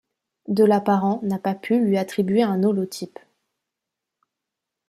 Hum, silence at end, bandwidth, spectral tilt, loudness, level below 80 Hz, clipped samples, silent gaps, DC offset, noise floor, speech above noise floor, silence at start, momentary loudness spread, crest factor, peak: none; 1.8 s; 14 kHz; -7 dB/octave; -21 LUFS; -68 dBFS; under 0.1%; none; under 0.1%; -84 dBFS; 64 dB; 0.5 s; 9 LU; 18 dB; -6 dBFS